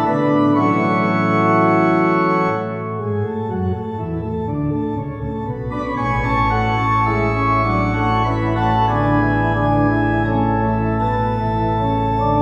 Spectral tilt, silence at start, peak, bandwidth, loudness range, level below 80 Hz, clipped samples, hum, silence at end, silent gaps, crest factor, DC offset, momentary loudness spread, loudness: -8.5 dB/octave; 0 s; -4 dBFS; 7 kHz; 5 LU; -32 dBFS; under 0.1%; none; 0 s; none; 14 dB; under 0.1%; 9 LU; -18 LUFS